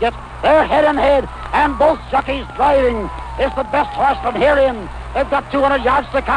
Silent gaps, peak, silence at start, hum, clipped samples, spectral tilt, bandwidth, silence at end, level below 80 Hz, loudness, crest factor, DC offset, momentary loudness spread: none; -4 dBFS; 0 s; none; under 0.1%; -6 dB/octave; 10 kHz; 0 s; -32 dBFS; -16 LUFS; 12 dB; under 0.1%; 8 LU